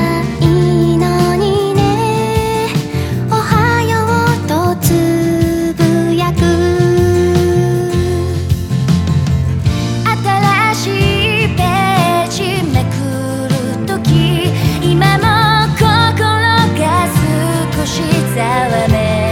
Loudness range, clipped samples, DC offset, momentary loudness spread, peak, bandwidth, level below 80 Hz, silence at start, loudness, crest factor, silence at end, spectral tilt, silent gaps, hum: 2 LU; under 0.1%; under 0.1%; 5 LU; 0 dBFS; 17 kHz; -30 dBFS; 0 s; -13 LUFS; 12 dB; 0 s; -6 dB/octave; none; none